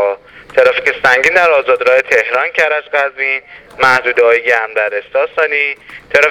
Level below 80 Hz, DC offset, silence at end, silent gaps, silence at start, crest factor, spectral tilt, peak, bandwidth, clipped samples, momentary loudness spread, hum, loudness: -52 dBFS; under 0.1%; 0 s; none; 0 s; 12 dB; -2.5 dB/octave; 0 dBFS; 15 kHz; 0.2%; 7 LU; none; -12 LUFS